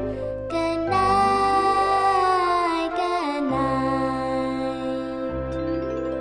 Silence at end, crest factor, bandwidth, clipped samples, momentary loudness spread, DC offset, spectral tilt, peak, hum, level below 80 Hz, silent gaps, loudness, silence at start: 0 s; 14 dB; 10 kHz; under 0.1%; 9 LU; under 0.1%; -5.5 dB/octave; -8 dBFS; none; -44 dBFS; none; -23 LUFS; 0 s